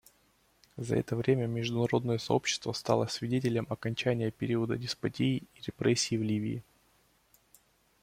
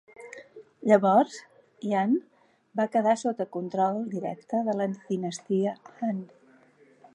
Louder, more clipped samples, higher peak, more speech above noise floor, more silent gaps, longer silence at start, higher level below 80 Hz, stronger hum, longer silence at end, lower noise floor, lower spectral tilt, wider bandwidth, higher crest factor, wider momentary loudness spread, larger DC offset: second, -31 LUFS vs -27 LUFS; neither; second, -12 dBFS vs -8 dBFS; first, 38 dB vs 33 dB; neither; first, 0.75 s vs 0.2 s; first, -64 dBFS vs -82 dBFS; neither; first, 1.4 s vs 0.9 s; first, -69 dBFS vs -59 dBFS; about the same, -5.5 dB/octave vs -6.5 dB/octave; first, 15.5 kHz vs 11 kHz; about the same, 22 dB vs 20 dB; second, 6 LU vs 14 LU; neither